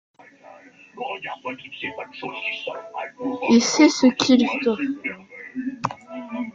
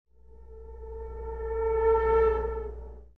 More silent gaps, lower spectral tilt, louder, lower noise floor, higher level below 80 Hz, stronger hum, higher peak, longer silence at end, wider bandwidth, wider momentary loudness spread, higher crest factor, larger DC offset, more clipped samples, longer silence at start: neither; second, -3.5 dB/octave vs -9 dB/octave; first, -22 LUFS vs -27 LUFS; about the same, -47 dBFS vs -50 dBFS; second, -66 dBFS vs -38 dBFS; neither; first, -4 dBFS vs -14 dBFS; about the same, 0.05 s vs 0.15 s; first, 7.6 kHz vs 3.8 kHz; second, 17 LU vs 22 LU; first, 20 dB vs 14 dB; second, under 0.1% vs 0.3%; neither; first, 0.45 s vs 0.3 s